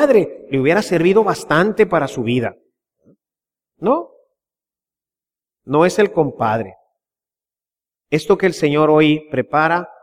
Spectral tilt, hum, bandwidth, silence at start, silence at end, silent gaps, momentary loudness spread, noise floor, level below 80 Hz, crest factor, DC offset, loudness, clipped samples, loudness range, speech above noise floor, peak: -6 dB/octave; none; 15.5 kHz; 0 s; 0.15 s; none; 8 LU; under -90 dBFS; -54 dBFS; 16 dB; under 0.1%; -16 LUFS; under 0.1%; 7 LU; over 74 dB; -2 dBFS